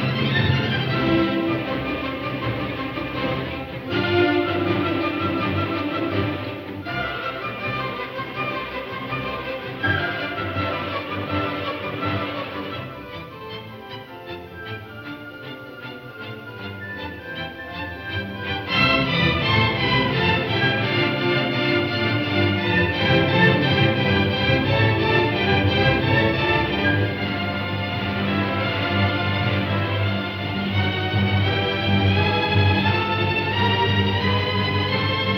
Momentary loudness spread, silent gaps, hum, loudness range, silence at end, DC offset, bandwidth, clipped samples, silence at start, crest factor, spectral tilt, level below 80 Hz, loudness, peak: 15 LU; none; none; 13 LU; 0 s; under 0.1%; 15.5 kHz; under 0.1%; 0 s; 18 dB; -7.5 dB/octave; -44 dBFS; -21 LUFS; -4 dBFS